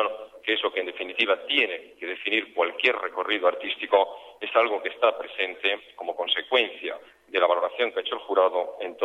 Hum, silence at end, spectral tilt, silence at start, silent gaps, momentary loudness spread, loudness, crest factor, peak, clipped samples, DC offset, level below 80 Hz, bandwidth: none; 0 s; -3 dB/octave; 0 s; none; 9 LU; -25 LUFS; 20 dB; -6 dBFS; under 0.1%; under 0.1%; -76 dBFS; 8.4 kHz